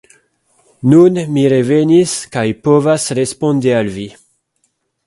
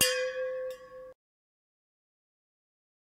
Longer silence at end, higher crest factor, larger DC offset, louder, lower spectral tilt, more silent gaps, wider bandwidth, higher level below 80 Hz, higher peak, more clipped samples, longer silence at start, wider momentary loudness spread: second, 0.95 s vs 1.9 s; second, 14 dB vs 26 dB; neither; first, -13 LUFS vs -33 LUFS; first, -6 dB/octave vs 0.5 dB/octave; neither; second, 11.5 kHz vs 16 kHz; first, -52 dBFS vs -74 dBFS; first, 0 dBFS vs -10 dBFS; neither; first, 0.85 s vs 0 s; second, 10 LU vs 20 LU